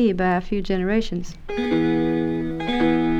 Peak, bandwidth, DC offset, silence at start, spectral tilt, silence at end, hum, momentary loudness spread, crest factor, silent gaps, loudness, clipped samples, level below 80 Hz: -8 dBFS; 8 kHz; under 0.1%; 0 s; -7 dB/octave; 0 s; none; 8 LU; 12 dB; none; -23 LUFS; under 0.1%; -36 dBFS